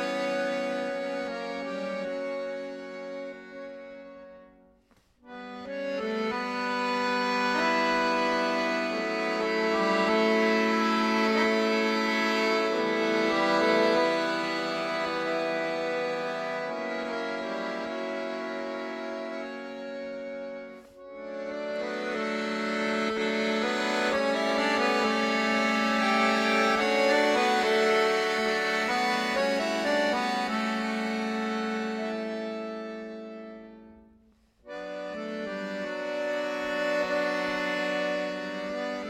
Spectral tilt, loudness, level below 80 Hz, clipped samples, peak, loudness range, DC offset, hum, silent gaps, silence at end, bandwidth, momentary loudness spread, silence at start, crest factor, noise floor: -4 dB/octave; -28 LUFS; -68 dBFS; under 0.1%; -10 dBFS; 13 LU; under 0.1%; none; none; 0 s; 16 kHz; 15 LU; 0 s; 18 dB; -64 dBFS